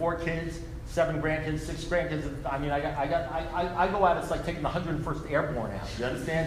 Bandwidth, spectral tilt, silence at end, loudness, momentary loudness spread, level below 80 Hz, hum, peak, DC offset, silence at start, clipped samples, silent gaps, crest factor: 15.5 kHz; -6 dB/octave; 0 s; -30 LUFS; 8 LU; -42 dBFS; none; -10 dBFS; under 0.1%; 0 s; under 0.1%; none; 18 dB